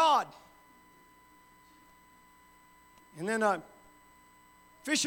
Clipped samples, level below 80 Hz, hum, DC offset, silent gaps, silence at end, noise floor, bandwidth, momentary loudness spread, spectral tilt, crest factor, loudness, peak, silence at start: under 0.1%; -74 dBFS; 60 Hz at -70 dBFS; under 0.1%; none; 0 s; -60 dBFS; 18.5 kHz; 27 LU; -2.5 dB/octave; 20 dB; -32 LUFS; -14 dBFS; 0 s